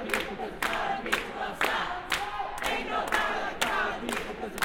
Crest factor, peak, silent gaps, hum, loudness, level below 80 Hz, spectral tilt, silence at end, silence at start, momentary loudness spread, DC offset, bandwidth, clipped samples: 22 dB; -10 dBFS; none; none; -30 LUFS; -50 dBFS; -2.5 dB/octave; 0 s; 0 s; 6 LU; under 0.1%; 17 kHz; under 0.1%